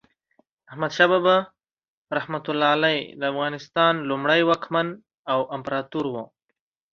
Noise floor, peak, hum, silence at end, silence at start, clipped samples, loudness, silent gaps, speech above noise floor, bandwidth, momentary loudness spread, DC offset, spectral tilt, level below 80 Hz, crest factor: -79 dBFS; -2 dBFS; none; 0.65 s; 0.7 s; under 0.1%; -23 LUFS; 1.73-1.77 s, 1.88-2.05 s, 5.18-5.25 s; 57 dB; 7.4 kHz; 11 LU; under 0.1%; -5.5 dB/octave; -68 dBFS; 22 dB